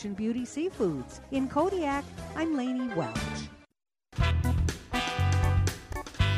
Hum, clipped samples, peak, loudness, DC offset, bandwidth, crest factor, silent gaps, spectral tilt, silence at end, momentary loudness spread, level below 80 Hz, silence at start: none; under 0.1%; -14 dBFS; -30 LUFS; under 0.1%; 15.5 kHz; 16 dB; none; -6 dB/octave; 0 s; 12 LU; -38 dBFS; 0 s